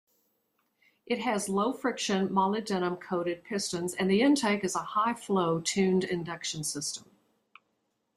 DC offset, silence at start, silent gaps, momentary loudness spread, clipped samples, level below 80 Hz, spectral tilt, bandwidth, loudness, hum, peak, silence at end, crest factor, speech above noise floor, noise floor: under 0.1%; 1.1 s; none; 8 LU; under 0.1%; -70 dBFS; -4.5 dB/octave; 15 kHz; -29 LUFS; none; -14 dBFS; 1.15 s; 16 dB; 49 dB; -78 dBFS